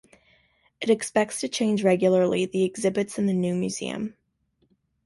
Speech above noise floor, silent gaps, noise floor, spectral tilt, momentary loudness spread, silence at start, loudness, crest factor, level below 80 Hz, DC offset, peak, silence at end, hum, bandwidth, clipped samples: 46 dB; none; -70 dBFS; -5.5 dB/octave; 10 LU; 0.8 s; -24 LUFS; 18 dB; -64 dBFS; under 0.1%; -8 dBFS; 0.95 s; none; 11.5 kHz; under 0.1%